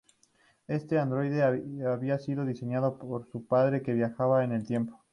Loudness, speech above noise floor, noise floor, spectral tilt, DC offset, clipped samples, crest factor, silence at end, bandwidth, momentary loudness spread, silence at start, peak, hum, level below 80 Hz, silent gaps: -30 LUFS; 38 dB; -67 dBFS; -9.5 dB/octave; under 0.1%; under 0.1%; 16 dB; 0.15 s; 10.5 kHz; 8 LU; 0.7 s; -14 dBFS; none; -68 dBFS; none